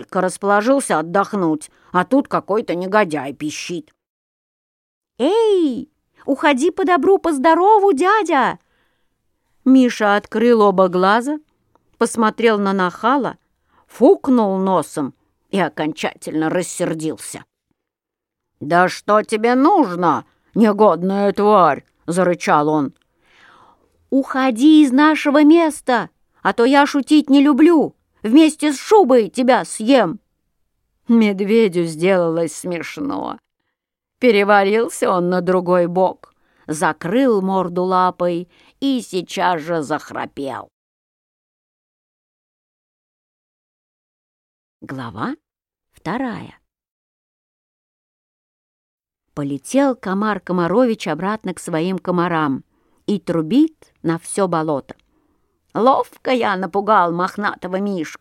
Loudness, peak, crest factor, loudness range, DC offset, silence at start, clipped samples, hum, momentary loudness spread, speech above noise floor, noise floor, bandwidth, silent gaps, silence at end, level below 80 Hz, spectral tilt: -17 LUFS; 0 dBFS; 18 dB; 13 LU; under 0.1%; 0 s; under 0.1%; none; 13 LU; 68 dB; -84 dBFS; 14 kHz; 4.09-5.01 s, 40.73-44.80 s, 46.91-48.98 s; 0.05 s; -62 dBFS; -5.5 dB/octave